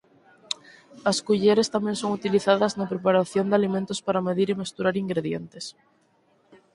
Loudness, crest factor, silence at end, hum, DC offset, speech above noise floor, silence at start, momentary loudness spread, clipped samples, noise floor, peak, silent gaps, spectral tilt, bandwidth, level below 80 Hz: -24 LUFS; 20 dB; 1.05 s; none; under 0.1%; 40 dB; 0.5 s; 13 LU; under 0.1%; -64 dBFS; -4 dBFS; none; -5 dB/octave; 11.5 kHz; -66 dBFS